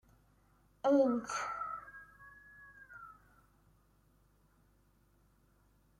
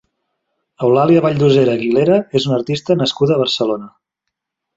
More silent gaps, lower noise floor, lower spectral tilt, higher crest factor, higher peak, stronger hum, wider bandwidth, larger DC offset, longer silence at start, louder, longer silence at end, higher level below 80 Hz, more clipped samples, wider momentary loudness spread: neither; second, -70 dBFS vs -79 dBFS; second, -4.5 dB/octave vs -6.5 dB/octave; first, 22 dB vs 14 dB; second, -18 dBFS vs -2 dBFS; neither; first, 14 kHz vs 8 kHz; neither; about the same, 0.85 s vs 0.8 s; second, -34 LUFS vs -15 LUFS; first, 2.9 s vs 0.9 s; second, -72 dBFS vs -56 dBFS; neither; first, 26 LU vs 7 LU